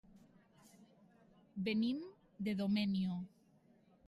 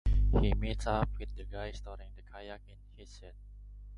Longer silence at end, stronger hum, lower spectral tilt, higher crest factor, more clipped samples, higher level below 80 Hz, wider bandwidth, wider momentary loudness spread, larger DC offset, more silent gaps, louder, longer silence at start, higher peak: first, 0.8 s vs 0 s; second, none vs 50 Hz at -45 dBFS; about the same, -7.5 dB/octave vs -7 dB/octave; about the same, 16 dB vs 16 dB; neither; second, -76 dBFS vs -36 dBFS; first, 12 kHz vs 9.6 kHz; second, 17 LU vs 24 LU; neither; neither; second, -39 LUFS vs -34 LUFS; first, 0.8 s vs 0.05 s; second, -24 dBFS vs -16 dBFS